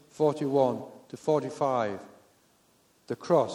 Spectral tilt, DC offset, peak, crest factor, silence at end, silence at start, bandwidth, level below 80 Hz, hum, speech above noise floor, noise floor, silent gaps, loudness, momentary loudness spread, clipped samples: -7 dB/octave; under 0.1%; -12 dBFS; 18 dB; 0 s; 0.2 s; 13 kHz; -76 dBFS; none; 38 dB; -65 dBFS; none; -29 LUFS; 13 LU; under 0.1%